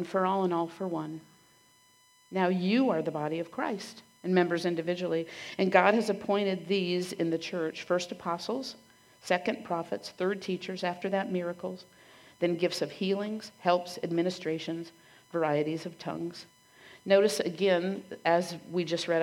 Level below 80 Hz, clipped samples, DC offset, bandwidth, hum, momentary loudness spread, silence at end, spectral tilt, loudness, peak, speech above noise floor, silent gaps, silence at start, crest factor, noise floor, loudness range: -78 dBFS; under 0.1%; under 0.1%; 16 kHz; none; 12 LU; 0 s; -5.5 dB/octave; -30 LUFS; -6 dBFS; 33 dB; none; 0 s; 24 dB; -63 dBFS; 5 LU